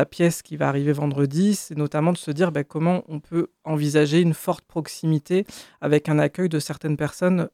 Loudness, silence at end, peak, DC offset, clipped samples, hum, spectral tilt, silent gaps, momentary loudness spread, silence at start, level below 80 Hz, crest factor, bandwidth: -23 LUFS; 0.05 s; -6 dBFS; under 0.1%; under 0.1%; none; -6.5 dB/octave; none; 7 LU; 0 s; -62 dBFS; 16 dB; 15.5 kHz